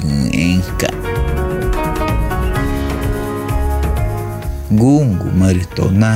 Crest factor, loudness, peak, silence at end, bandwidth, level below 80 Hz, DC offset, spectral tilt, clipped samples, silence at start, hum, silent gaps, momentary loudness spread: 14 dB; -16 LUFS; -2 dBFS; 0 s; 16 kHz; -22 dBFS; under 0.1%; -6.5 dB/octave; under 0.1%; 0 s; none; none; 7 LU